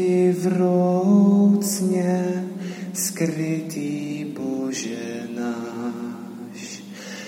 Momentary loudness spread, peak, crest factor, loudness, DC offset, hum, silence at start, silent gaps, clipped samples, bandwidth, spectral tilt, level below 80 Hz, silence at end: 18 LU; -8 dBFS; 14 dB; -22 LUFS; under 0.1%; none; 0 s; none; under 0.1%; 16.5 kHz; -6 dB/octave; -74 dBFS; 0 s